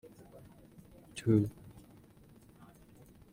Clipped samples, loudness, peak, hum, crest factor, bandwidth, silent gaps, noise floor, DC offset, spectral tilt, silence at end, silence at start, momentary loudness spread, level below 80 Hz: under 0.1%; -32 LUFS; -16 dBFS; none; 24 dB; 16.5 kHz; none; -59 dBFS; under 0.1%; -8 dB/octave; 1.6 s; 0.05 s; 28 LU; -64 dBFS